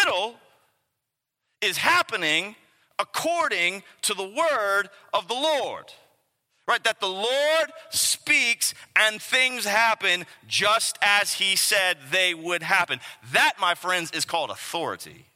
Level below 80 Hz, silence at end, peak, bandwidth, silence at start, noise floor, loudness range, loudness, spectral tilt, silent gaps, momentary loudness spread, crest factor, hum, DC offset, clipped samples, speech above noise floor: -76 dBFS; 0.2 s; -2 dBFS; 16.5 kHz; 0 s; -82 dBFS; 5 LU; -23 LUFS; -0.5 dB/octave; none; 10 LU; 22 dB; none; under 0.1%; under 0.1%; 58 dB